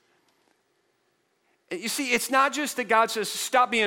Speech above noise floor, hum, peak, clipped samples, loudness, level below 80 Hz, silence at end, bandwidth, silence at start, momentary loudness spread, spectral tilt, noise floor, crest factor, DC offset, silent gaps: 47 dB; none; -6 dBFS; under 0.1%; -24 LUFS; -74 dBFS; 0 s; 17 kHz; 1.7 s; 8 LU; -1.5 dB/octave; -71 dBFS; 20 dB; under 0.1%; none